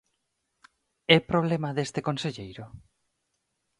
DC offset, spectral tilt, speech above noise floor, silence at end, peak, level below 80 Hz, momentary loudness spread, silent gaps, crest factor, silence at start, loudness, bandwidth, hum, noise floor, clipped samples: under 0.1%; -5.5 dB/octave; 52 dB; 1 s; -4 dBFS; -60 dBFS; 21 LU; none; 26 dB; 1.1 s; -26 LUFS; 11 kHz; none; -78 dBFS; under 0.1%